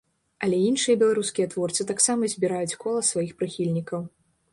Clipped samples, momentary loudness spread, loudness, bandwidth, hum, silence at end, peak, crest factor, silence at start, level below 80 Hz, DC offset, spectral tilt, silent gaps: under 0.1%; 9 LU; -24 LUFS; 11.5 kHz; none; 0.45 s; -6 dBFS; 20 dB; 0.4 s; -66 dBFS; under 0.1%; -4 dB/octave; none